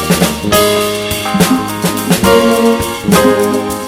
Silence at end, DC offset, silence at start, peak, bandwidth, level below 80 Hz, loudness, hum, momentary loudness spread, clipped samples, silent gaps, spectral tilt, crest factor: 0 s; under 0.1%; 0 s; 0 dBFS; 19 kHz; -34 dBFS; -11 LUFS; none; 6 LU; 0.2%; none; -4.5 dB/octave; 12 dB